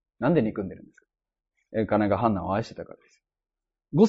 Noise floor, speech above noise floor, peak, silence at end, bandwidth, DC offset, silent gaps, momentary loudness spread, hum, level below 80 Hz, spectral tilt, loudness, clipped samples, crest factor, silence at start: -89 dBFS; 63 dB; -6 dBFS; 0 s; 7.8 kHz; under 0.1%; none; 17 LU; none; -56 dBFS; -8.5 dB/octave; -26 LUFS; under 0.1%; 20 dB; 0.2 s